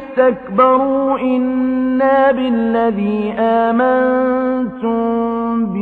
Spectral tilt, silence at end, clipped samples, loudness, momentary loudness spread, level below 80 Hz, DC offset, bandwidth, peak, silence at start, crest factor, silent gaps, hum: -9 dB/octave; 0 s; under 0.1%; -15 LUFS; 6 LU; -48 dBFS; under 0.1%; 4.4 kHz; 0 dBFS; 0 s; 14 dB; none; none